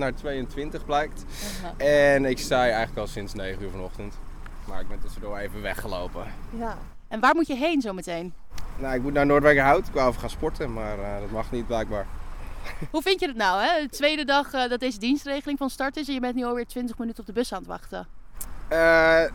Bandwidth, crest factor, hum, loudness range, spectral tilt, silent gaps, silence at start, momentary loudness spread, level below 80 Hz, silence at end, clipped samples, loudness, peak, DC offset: 18 kHz; 20 dB; none; 8 LU; -4.5 dB/octave; none; 0 s; 20 LU; -36 dBFS; 0 s; under 0.1%; -25 LUFS; -4 dBFS; under 0.1%